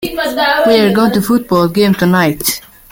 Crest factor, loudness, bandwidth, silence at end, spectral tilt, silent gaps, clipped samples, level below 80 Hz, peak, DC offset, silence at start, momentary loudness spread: 12 dB; -12 LUFS; 17 kHz; 0.3 s; -5 dB/octave; none; under 0.1%; -42 dBFS; 0 dBFS; under 0.1%; 0 s; 7 LU